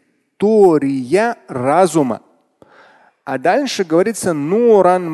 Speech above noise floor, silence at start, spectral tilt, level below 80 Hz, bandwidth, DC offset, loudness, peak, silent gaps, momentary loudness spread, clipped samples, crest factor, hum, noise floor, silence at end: 36 dB; 0.4 s; -5.5 dB/octave; -60 dBFS; 12.5 kHz; under 0.1%; -15 LUFS; 0 dBFS; none; 10 LU; under 0.1%; 14 dB; none; -50 dBFS; 0 s